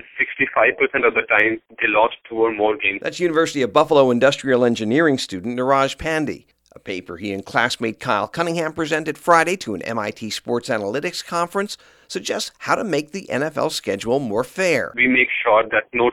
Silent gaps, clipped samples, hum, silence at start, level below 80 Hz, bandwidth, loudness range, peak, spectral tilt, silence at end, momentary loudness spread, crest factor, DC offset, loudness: none; under 0.1%; none; 0.15 s; -56 dBFS; 16 kHz; 6 LU; 0 dBFS; -4.5 dB/octave; 0 s; 10 LU; 20 dB; under 0.1%; -19 LUFS